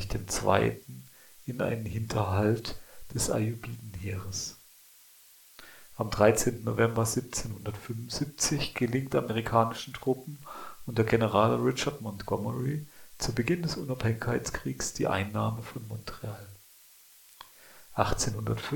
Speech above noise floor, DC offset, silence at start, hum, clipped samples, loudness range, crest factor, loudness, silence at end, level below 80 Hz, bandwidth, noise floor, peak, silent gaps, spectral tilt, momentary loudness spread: 27 dB; under 0.1%; 0 s; none; under 0.1%; 7 LU; 24 dB; -30 LUFS; 0 s; -50 dBFS; 18 kHz; -57 dBFS; -8 dBFS; none; -5 dB/octave; 18 LU